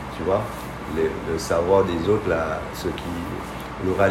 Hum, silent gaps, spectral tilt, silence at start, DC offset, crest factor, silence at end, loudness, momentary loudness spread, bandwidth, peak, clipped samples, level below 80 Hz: none; none; -6 dB/octave; 0 s; under 0.1%; 18 dB; 0 s; -24 LUFS; 11 LU; 16 kHz; -6 dBFS; under 0.1%; -40 dBFS